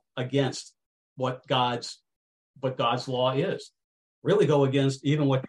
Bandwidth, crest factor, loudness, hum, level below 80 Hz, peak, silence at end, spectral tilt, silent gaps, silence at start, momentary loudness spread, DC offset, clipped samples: 11 kHz; 16 dB; -26 LUFS; none; -68 dBFS; -10 dBFS; 0 s; -6 dB/octave; 0.86-1.16 s, 2.16-2.54 s, 3.84-4.22 s; 0.15 s; 12 LU; under 0.1%; under 0.1%